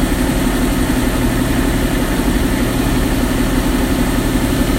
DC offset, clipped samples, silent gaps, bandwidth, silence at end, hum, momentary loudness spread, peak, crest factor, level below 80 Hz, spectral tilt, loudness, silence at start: under 0.1%; under 0.1%; none; 16 kHz; 0 s; none; 1 LU; -2 dBFS; 12 dB; -20 dBFS; -5 dB/octave; -16 LUFS; 0 s